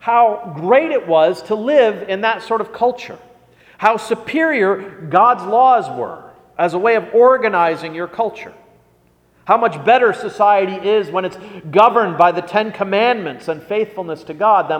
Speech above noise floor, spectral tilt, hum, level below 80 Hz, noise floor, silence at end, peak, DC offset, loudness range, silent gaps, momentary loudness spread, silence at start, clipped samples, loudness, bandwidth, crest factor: 40 dB; -6 dB/octave; none; -62 dBFS; -55 dBFS; 0 s; 0 dBFS; under 0.1%; 3 LU; none; 13 LU; 0.05 s; under 0.1%; -15 LUFS; 10.5 kHz; 16 dB